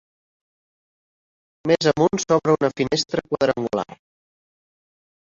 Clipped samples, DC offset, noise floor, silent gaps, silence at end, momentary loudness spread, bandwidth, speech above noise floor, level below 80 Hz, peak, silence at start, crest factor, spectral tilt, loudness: under 0.1%; under 0.1%; under -90 dBFS; none; 1.4 s; 9 LU; 7.6 kHz; over 70 dB; -58 dBFS; -4 dBFS; 1.65 s; 20 dB; -5 dB/octave; -21 LUFS